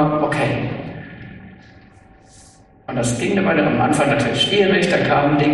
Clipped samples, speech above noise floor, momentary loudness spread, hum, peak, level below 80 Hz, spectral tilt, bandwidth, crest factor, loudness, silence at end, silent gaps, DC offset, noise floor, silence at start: under 0.1%; 31 dB; 19 LU; none; -4 dBFS; -46 dBFS; -5 dB/octave; 11.5 kHz; 16 dB; -17 LUFS; 0 s; none; under 0.1%; -47 dBFS; 0 s